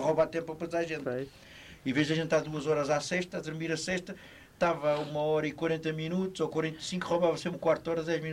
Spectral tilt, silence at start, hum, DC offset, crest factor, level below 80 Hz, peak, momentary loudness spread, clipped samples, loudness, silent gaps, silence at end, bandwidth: -5.5 dB/octave; 0 s; none; under 0.1%; 18 dB; -62 dBFS; -14 dBFS; 8 LU; under 0.1%; -31 LUFS; none; 0 s; 15.5 kHz